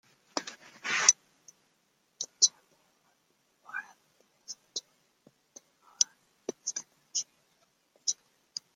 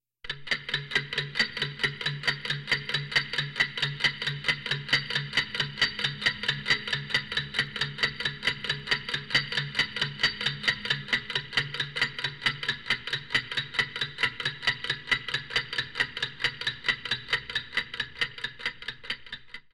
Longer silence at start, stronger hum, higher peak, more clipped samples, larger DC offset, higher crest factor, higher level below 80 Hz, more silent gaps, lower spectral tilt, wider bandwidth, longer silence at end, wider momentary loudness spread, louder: about the same, 0.35 s vs 0.25 s; neither; first, -2 dBFS vs -12 dBFS; neither; neither; first, 34 dB vs 20 dB; second, under -90 dBFS vs -60 dBFS; neither; second, 2.5 dB/octave vs -2.5 dB/octave; first, 16 kHz vs 14 kHz; first, 0.6 s vs 0.15 s; first, 20 LU vs 5 LU; second, -31 LUFS vs -28 LUFS